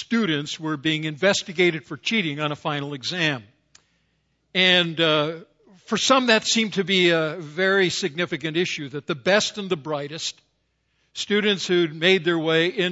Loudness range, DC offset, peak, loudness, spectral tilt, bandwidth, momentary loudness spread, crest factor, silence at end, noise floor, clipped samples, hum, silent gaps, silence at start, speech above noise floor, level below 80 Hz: 5 LU; under 0.1%; -2 dBFS; -22 LUFS; -3.5 dB/octave; 8 kHz; 10 LU; 22 dB; 0 s; -70 dBFS; under 0.1%; none; none; 0 s; 48 dB; -68 dBFS